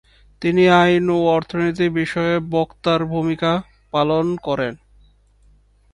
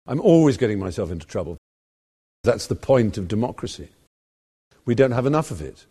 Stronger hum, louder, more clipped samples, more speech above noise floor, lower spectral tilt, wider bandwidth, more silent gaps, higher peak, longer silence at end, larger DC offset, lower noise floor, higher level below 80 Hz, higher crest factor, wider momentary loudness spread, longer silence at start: first, 50 Hz at -55 dBFS vs none; about the same, -19 LUFS vs -21 LUFS; neither; second, 36 dB vs over 69 dB; about the same, -7 dB/octave vs -7 dB/octave; second, 11 kHz vs 13 kHz; second, none vs 1.58-2.44 s, 4.07-4.71 s; about the same, 0 dBFS vs -2 dBFS; first, 1.2 s vs 0.2 s; neither; second, -54 dBFS vs under -90 dBFS; about the same, -48 dBFS vs -46 dBFS; about the same, 18 dB vs 20 dB; second, 10 LU vs 17 LU; first, 0.4 s vs 0.05 s